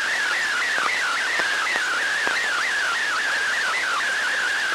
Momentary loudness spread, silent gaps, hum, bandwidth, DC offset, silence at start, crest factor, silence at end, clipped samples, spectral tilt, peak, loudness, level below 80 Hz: 1 LU; none; none; 16 kHz; under 0.1%; 0 s; 18 dB; 0 s; under 0.1%; 1 dB/octave; -4 dBFS; -21 LUFS; -64 dBFS